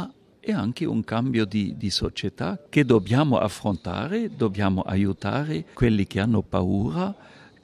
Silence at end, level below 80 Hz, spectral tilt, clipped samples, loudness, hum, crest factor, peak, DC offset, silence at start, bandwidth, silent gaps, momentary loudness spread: 0.5 s; -46 dBFS; -6.5 dB/octave; under 0.1%; -25 LUFS; none; 18 dB; -6 dBFS; under 0.1%; 0 s; 13.5 kHz; none; 9 LU